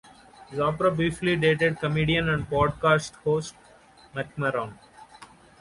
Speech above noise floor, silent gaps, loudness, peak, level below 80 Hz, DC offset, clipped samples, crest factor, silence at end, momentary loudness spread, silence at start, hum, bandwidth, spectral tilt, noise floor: 29 dB; none; -25 LUFS; -8 dBFS; -48 dBFS; under 0.1%; under 0.1%; 18 dB; 0.35 s; 13 LU; 0.4 s; none; 11.5 kHz; -6 dB/octave; -54 dBFS